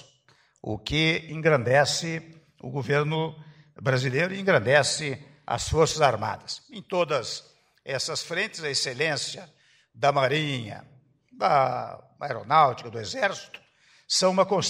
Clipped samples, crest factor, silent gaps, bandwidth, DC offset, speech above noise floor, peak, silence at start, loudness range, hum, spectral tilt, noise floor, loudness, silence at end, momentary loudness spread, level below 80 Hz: under 0.1%; 20 dB; none; 15.5 kHz; under 0.1%; 37 dB; -6 dBFS; 0.65 s; 3 LU; none; -4 dB/octave; -63 dBFS; -25 LUFS; 0 s; 16 LU; -54 dBFS